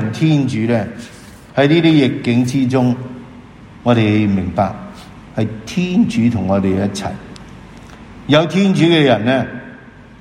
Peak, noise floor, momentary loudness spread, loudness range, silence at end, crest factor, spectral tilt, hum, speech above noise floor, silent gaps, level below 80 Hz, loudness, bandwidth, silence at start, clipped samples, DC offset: 0 dBFS; -38 dBFS; 20 LU; 4 LU; 0.05 s; 16 dB; -6.5 dB/octave; none; 24 dB; none; -46 dBFS; -15 LUFS; 12.5 kHz; 0 s; under 0.1%; under 0.1%